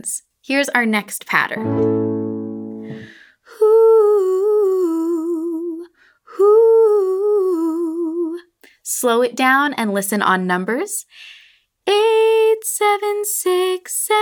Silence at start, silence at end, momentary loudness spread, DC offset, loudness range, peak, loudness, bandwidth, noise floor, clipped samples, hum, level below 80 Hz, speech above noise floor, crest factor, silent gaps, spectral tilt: 0.05 s; 0 s; 15 LU; under 0.1%; 2 LU; 0 dBFS; -17 LUFS; over 20 kHz; -52 dBFS; under 0.1%; none; -68 dBFS; 34 dB; 16 dB; none; -4 dB/octave